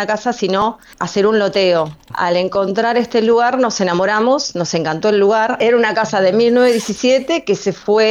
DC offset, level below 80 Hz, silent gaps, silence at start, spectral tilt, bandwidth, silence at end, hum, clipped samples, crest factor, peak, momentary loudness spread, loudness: under 0.1%; -54 dBFS; none; 0 s; -4.5 dB/octave; 13 kHz; 0 s; none; under 0.1%; 10 dB; -4 dBFS; 6 LU; -15 LUFS